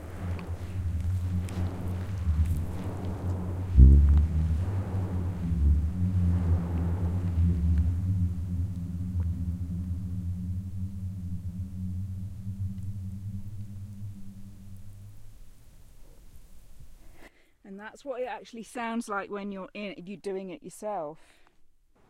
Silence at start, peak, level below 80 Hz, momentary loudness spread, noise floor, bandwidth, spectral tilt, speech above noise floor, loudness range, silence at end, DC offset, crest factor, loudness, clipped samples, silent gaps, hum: 0 s; -4 dBFS; -32 dBFS; 15 LU; -57 dBFS; 11 kHz; -8.5 dB/octave; 21 dB; 18 LU; 0.45 s; under 0.1%; 26 dB; -30 LUFS; under 0.1%; none; none